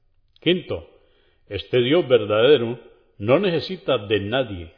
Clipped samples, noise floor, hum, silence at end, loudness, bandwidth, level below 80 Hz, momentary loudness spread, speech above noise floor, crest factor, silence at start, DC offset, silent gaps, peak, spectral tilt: under 0.1%; -59 dBFS; none; 0.1 s; -20 LUFS; 5.4 kHz; -54 dBFS; 16 LU; 38 dB; 18 dB; 0.45 s; under 0.1%; none; -4 dBFS; -8.5 dB/octave